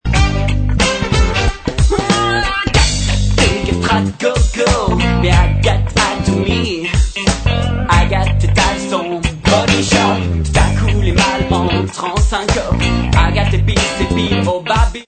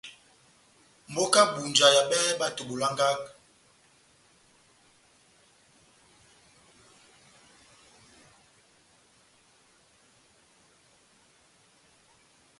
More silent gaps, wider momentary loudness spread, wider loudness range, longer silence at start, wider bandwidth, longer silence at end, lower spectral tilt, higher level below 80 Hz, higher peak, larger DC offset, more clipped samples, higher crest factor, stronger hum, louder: neither; second, 4 LU vs 16 LU; second, 1 LU vs 10 LU; about the same, 0.05 s vs 0.05 s; second, 9.2 kHz vs 11.5 kHz; second, 0.05 s vs 9.3 s; first, -5 dB/octave vs -1.5 dB/octave; first, -18 dBFS vs -74 dBFS; first, 0 dBFS vs -6 dBFS; neither; neither; second, 14 dB vs 26 dB; neither; first, -14 LUFS vs -24 LUFS